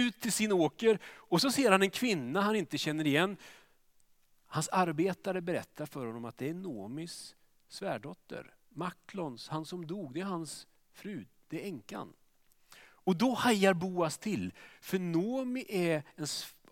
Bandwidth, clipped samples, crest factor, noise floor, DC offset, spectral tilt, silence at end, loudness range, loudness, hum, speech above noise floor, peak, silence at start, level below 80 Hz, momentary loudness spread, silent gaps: 17 kHz; under 0.1%; 26 dB; -67 dBFS; under 0.1%; -4.5 dB/octave; 0.2 s; 12 LU; -33 LUFS; none; 34 dB; -8 dBFS; 0 s; -76 dBFS; 17 LU; none